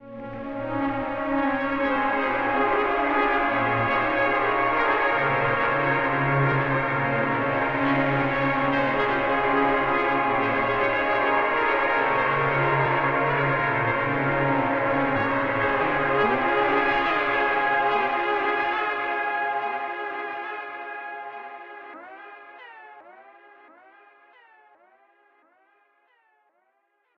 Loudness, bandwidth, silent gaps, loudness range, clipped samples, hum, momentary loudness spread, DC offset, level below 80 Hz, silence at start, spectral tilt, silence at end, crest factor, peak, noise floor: -23 LUFS; 6.6 kHz; none; 9 LU; under 0.1%; none; 12 LU; under 0.1%; -50 dBFS; 0 s; -8 dB/octave; 3.95 s; 14 dB; -10 dBFS; -70 dBFS